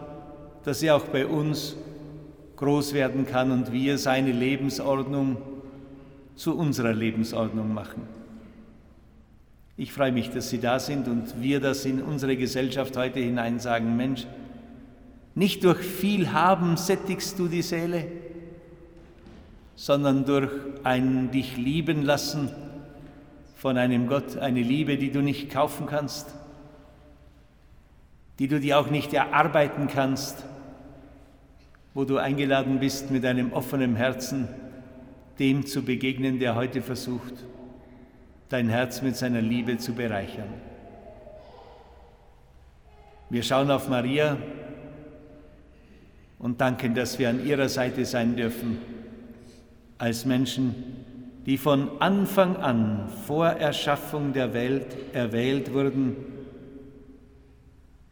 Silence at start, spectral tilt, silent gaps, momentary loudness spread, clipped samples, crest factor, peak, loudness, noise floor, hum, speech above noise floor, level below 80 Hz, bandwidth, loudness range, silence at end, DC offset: 0 s; -5.5 dB/octave; none; 21 LU; under 0.1%; 24 dB; -4 dBFS; -26 LUFS; -54 dBFS; none; 29 dB; -54 dBFS; over 20 kHz; 5 LU; 0.95 s; under 0.1%